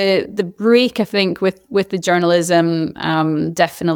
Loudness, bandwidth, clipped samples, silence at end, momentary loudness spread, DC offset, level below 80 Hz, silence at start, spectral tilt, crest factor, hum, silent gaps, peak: -17 LUFS; 19.5 kHz; under 0.1%; 0 s; 6 LU; under 0.1%; -58 dBFS; 0 s; -5 dB/octave; 14 dB; none; none; -2 dBFS